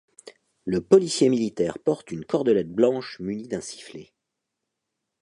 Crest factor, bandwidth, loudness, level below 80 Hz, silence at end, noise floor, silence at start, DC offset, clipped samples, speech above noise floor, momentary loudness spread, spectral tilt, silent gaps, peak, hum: 22 dB; 11 kHz; -24 LUFS; -62 dBFS; 1.2 s; -82 dBFS; 0.25 s; under 0.1%; under 0.1%; 59 dB; 18 LU; -5.5 dB/octave; none; -4 dBFS; none